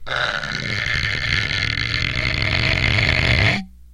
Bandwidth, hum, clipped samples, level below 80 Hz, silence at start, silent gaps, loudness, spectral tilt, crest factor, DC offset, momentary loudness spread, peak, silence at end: 12 kHz; none; under 0.1%; -30 dBFS; 0 s; none; -19 LUFS; -4 dB/octave; 20 dB; under 0.1%; 6 LU; 0 dBFS; 0 s